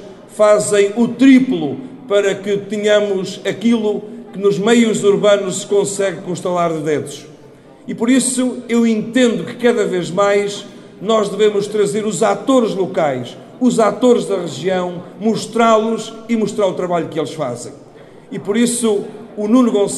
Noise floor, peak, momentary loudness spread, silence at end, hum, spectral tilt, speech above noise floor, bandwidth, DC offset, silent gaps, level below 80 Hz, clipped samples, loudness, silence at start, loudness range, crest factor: -41 dBFS; 0 dBFS; 12 LU; 0 s; none; -4.5 dB/octave; 26 dB; 13 kHz; under 0.1%; none; -62 dBFS; under 0.1%; -16 LUFS; 0 s; 3 LU; 16 dB